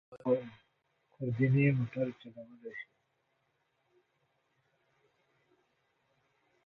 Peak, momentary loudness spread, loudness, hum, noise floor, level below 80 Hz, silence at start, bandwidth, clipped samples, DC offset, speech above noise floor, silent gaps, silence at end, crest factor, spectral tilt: -16 dBFS; 23 LU; -32 LUFS; none; -78 dBFS; -72 dBFS; 0.1 s; 4.2 kHz; under 0.1%; under 0.1%; 46 dB; none; 3.85 s; 20 dB; -10.5 dB/octave